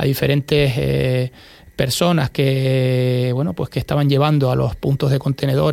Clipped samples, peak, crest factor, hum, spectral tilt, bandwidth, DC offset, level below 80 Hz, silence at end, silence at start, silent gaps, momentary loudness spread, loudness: under 0.1%; -2 dBFS; 16 dB; none; -6.5 dB/octave; 16.5 kHz; under 0.1%; -40 dBFS; 0 s; 0 s; none; 6 LU; -18 LUFS